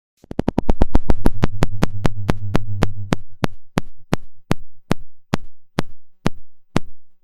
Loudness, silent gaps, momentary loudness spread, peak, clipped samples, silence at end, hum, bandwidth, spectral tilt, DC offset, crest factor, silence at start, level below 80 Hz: -25 LUFS; none; 6 LU; 0 dBFS; under 0.1%; 0.1 s; none; 10.5 kHz; -6.5 dB/octave; under 0.1%; 16 dB; 0.4 s; -26 dBFS